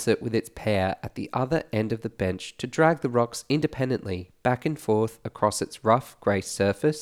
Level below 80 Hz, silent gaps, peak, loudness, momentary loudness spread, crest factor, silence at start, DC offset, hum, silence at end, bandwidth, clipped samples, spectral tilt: -56 dBFS; none; -6 dBFS; -26 LUFS; 7 LU; 20 dB; 0 s; under 0.1%; none; 0 s; 16.5 kHz; under 0.1%; -5.5 dB/octave